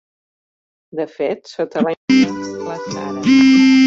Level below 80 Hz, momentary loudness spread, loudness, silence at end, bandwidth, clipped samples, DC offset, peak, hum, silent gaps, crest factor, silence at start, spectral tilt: -58 dBFS; 16 LU; -16 LUFS; 0 s; 7.8 kHz; under 0.1%; under 0.1%; -2 dBFS; none; 1.97-2.08 s; 12 dB; 0.95 s; -5 dB/octave